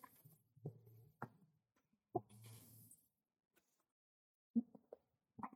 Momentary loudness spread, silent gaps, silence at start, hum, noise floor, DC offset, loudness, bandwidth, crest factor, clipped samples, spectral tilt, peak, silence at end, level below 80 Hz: 23 LU; 3.92-4.54 s; 0.05 s; none; -85 dBFS; under 0.1%; -51 LUFS; 17 kHz; 26 dB; under 0.1%; -7.5 dB/octave; -28 dBFS; 0 s; under -90 dBFS